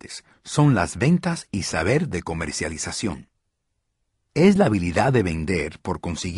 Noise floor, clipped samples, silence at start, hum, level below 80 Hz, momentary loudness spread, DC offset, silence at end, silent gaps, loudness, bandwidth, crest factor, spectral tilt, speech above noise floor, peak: -75 dBFS; under 0.1%; 0.05 s; none; -44 dBFS; 11 LU; under 0.1%; 0 s; none; -22 LUFS; 11.5 kHz; 18 dB; -5.5 dB/octave; 54 dB; -4 dBFS